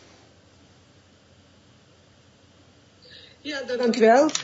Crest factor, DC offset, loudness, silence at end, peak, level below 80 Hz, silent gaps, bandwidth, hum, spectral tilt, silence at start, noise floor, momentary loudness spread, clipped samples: 20 dB; under 0.1%; -21 LUFS; 0 s; -6 dBFS; -72 dBFS; none; 8 kHz; none; -3.5 dB/octave; 3.45 s; -56 dBFS; 28 LU; under 0.1%